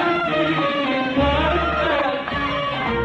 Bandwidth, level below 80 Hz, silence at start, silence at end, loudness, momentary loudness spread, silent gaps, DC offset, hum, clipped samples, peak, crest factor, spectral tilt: 8.8 kHz; -34 dBFS; 0 s; 0 s; -20 LUFS; 4 LU; none; under 0.1%; none; under 0.1%; -8 dBFS; 12 dB; -6.5 dB/octave